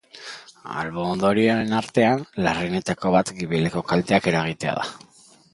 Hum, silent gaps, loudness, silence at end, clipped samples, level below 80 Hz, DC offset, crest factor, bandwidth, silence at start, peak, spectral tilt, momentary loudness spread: none; none; -22 LUFS; 0.55 s; under 0.1%; -52 dBFS; under 0.1%; 20 dB; 11.5 kHz; 0.15 s; -2 dBFS; -5.5 dB/octave; 13 LU